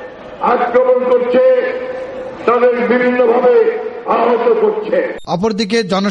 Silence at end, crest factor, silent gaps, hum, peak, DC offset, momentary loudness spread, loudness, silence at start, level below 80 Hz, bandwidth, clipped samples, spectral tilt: 0 s; 12 dB; none; none; 0 dBFS; under 0.1%; 9 LU; -13 LUFS; 0 s; -52 dBFS; 9.2 kHz; under 0.1%; -5.5 dB/octave